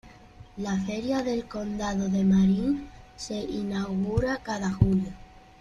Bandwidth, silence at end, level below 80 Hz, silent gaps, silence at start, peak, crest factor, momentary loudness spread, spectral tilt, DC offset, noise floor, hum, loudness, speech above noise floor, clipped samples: 8.6 kHz; 0.25 s; -44 dBFS; none; 0.05 s; -6 dBFS; 22 dB; 14 LU; -7 dB/octave; under 0.1%; -49 dBFS; none; -27 LUFS; 23 dB; under 0.1%